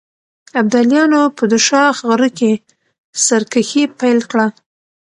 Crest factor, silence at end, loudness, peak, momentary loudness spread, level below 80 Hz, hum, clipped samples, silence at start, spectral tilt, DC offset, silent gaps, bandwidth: 14 dB; 0.5 s; -14 LUFS; 0 dBFS; 7 LU; -64 dBFS; none; under 0.1%; 0.55 s; -3 dB/octave; under 0.1%; 2.98-3.13 s; 11.5 kHz